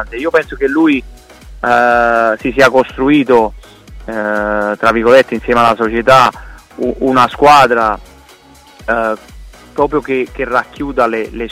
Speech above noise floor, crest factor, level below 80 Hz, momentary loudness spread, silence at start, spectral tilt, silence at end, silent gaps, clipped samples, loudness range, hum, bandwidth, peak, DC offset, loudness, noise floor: 30 dB; 12 dB; -36 dBFS; 12 LU; 0 s; -5 dB/octave; 0 s; none; under 0.1%; 6 LU; none; 16 kHz; 0 dBFS; under 0.1%; -12 LUFS; -41 dBFS